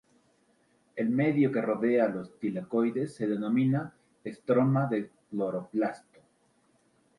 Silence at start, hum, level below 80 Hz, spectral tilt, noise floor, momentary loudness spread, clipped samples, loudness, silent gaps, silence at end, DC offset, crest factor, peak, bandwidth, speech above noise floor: 0.95 s; none; -74 dBFS; -9 dB/octave; -68 dBFS; 14 LU; under 0.1%; -29 LUFS; none; 1.2 s; under 0.1%; 16 dB; -14 dBFS; 11 kHz; 40 dB